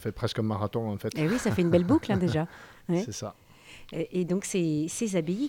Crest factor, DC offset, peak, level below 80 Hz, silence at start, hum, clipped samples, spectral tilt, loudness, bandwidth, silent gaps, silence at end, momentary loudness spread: 18 dB; under 0.1%; -10 dBFS; -54 dBFS; 0 s; none; under 0.1%; -6 dB/octave; -28 LUFS; 17 kHz; none; 0 s; 12 LU